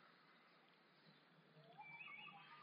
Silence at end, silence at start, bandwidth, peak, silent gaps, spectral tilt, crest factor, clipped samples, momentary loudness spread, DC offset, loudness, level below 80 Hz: 0 s; 0 s; 5.2 kHz; -46 dBFS; none; -1 dB/octave; 16 dB; under 0.1%; 14 LU; under 0.1%; -58 LUFS; under -90 dBFS